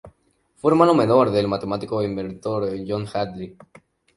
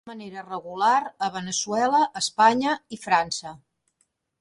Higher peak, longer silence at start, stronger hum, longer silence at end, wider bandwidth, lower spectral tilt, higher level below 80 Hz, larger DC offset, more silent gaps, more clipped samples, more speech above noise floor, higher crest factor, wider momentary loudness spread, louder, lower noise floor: first, -2 dBFS vs -6 dBFS; about the same, 0.05 s vs 0.05 s; neither; second, 0.65 s vs 0.85 s; about the same, 11.5 kHz vs 11.5 kHz; first, -7.5 dB/octave vs -2.5 dB/octave; first, -54 dBFS vs -66 dBFS; neither; neither; neither; second, 42 dB vs 48 dB; about the same, 20 dB vs 20 dB; second, 13 LU vs 16 LU; about the same, -21 LUFS vs -23 LUFS; second, -62 dBFS vs -72 dBFS